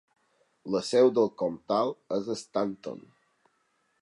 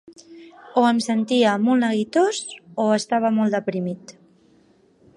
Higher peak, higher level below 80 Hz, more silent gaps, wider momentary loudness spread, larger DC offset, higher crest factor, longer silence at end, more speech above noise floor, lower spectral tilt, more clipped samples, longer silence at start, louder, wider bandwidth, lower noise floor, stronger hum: second, -10 dBFS vs -4 dBFS; about the same, -74 dBFS vs -72 dBFS; neither; first, 18 LU vs 11 LU; neither; about the same, 20 dB vs 16 dB; about the same, 1 s vs 1.05 s; first, 45 dB vs 37 dB; about the same, -5.5 dB/octave vs -5 dB/octave; neither; first, 0.65 s vs 0.3 s; second, -28 LUFS vs -21 LUFS; about the same, 11 kHz vs 11 kHz; first, -73 dBFS vs -57 dBFS; neither